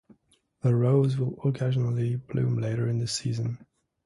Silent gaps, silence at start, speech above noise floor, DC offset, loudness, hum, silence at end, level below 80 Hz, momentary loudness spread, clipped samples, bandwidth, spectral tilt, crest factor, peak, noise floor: none; 0.65 s; 42 dB; under 0.1%; -27 LUFS; none; 0.5 s; -60 dBFS; 8 LU; under 0.1%; 11.5 kHz; -7 dB/octave; 16 dB; -10 dBFS; -67 dBFS